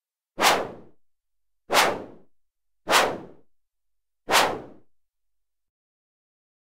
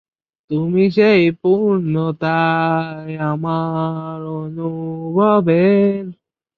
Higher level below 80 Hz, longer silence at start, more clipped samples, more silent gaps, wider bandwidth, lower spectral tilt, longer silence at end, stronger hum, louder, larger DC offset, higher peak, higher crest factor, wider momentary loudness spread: about the same, -62 dBFS vs -60 dBFS; about the same, 0.4 s vs 0.5 s; neither; neither; first, 16 kHz vs 5.8 kHz; second, -1 dB/octave vs -9.5 dB/octave; first, 1.95 s vs 0.45 s; neither; second, -22 LUFS vs -17 LUFS; neither; about the same, -4 dBFS vs -2 dBFS; first, 24 dB vs 16 dB; first, 16 LU vs 13 LU